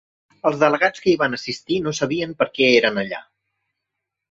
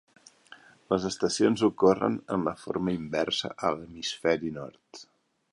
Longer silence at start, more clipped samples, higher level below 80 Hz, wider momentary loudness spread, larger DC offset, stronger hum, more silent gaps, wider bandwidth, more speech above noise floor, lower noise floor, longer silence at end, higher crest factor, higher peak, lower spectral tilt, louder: about the same, 0.45 s vs 0.5 s; neither; about the same, -60 dBFS vs -60 dBFS; second, 11 LU vs 16 LU; neither; neither; neither; second, 7.8 kHz vs 11.5 kHz; first, 62 dB vs 26 dB; first, -81 dBFS vs -54 dBFS; first, 1.1 s vs 0.5 s; about the same, 20 dB vs 20 dB; first, -2 dBFS vs -8 dBFS; about the same, -4.5 dB/octave vs -5 dB/octave; first, -19 LUFS vs -28 LUFS